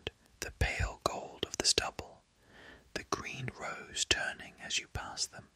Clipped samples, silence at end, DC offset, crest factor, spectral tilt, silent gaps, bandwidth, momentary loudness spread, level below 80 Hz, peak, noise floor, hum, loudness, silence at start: under 0.1%; 0.1 s; under 0.1%; 30 dB; -2 dB/octave; none; 16 kHz; 16 LU; -48 dBFS; -8 dBFS; -60 dBFS; none; -35 LUFS; 0.05 s